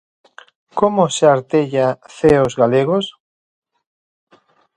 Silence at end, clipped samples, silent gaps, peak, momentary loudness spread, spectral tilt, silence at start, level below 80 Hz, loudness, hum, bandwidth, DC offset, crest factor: 1.65 s; under 0.1%; none; 0 dBFS; 7 LU; -5.5 dB/octave; 0.75 s; -48 dBFS; -16 LUFS; none; 11 kHz; under 0.1%; 18 dB